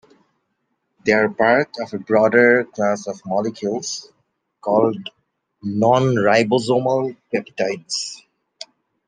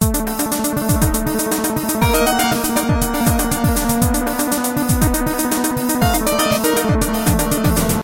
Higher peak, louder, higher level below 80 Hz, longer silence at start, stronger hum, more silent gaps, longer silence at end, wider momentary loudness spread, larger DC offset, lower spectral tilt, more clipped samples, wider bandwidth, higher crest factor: about the same, -2 dBFS vs -2 dBFS; about the same, -19 LUFS vs -17 LUFS; second, -64 dBFS vs -26 dBFS; first, 1.05 s vs 0 s; neither; neither; first, 0.9 s vs 0 s; first, 16 LU vs 3 LU; neither; about the same, -5 dB/octave vs -4.5 dB/octave; neither; second, 10 kHz vs 17.5 kHz; about the same, 18 dB vs 14 dB